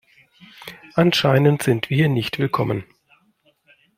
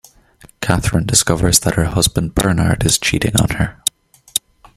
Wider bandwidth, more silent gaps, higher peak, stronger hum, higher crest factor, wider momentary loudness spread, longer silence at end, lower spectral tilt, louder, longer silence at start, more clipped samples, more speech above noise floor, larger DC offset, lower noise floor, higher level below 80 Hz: about the same, 16 kHz vs 16.5 kHz; neither; about the same, -2 dBFS vs 0 dBFS; neither; about the same, 18 dB vs 16 dB; first, 19 LU vs 9 LU; first, 1.15 s vs 0.4 s; first, -6 dB/octave vs -3.5 dB/octave; second, -19 LUFS vs -16 LUFS; about the same, 0.6 s vs 0.6 s; neither; first, 43 dB vs 32 dB; neither; first, -62 dBFS vs -47 dBFS; second, -56 dBFS vs -32 dBFS